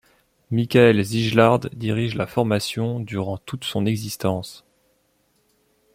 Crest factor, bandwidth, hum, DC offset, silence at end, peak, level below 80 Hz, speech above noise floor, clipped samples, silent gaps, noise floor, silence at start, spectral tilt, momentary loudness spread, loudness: 20 dB; 16 kHz; none; under 0.1%; 1.35 s; -2 dBFS; -56 dBFS; 45 dB; under 0.1%; none; -65 dBFS; 0.5 s; -6 dB/octave; 12 LU; -21 LUFS